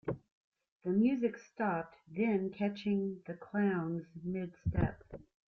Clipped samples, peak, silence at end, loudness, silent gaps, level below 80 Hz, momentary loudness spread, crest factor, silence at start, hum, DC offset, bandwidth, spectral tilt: under 0.1%; -20 dBFS; 0.3 s; -36 LUFS; 0.32-0.52 s, 0.72-0.80 s; -56 dBFS; 13 LU; 16 dB; 0.05 s; none; under 0.1%; 6.4 kHz; -9 dB/octave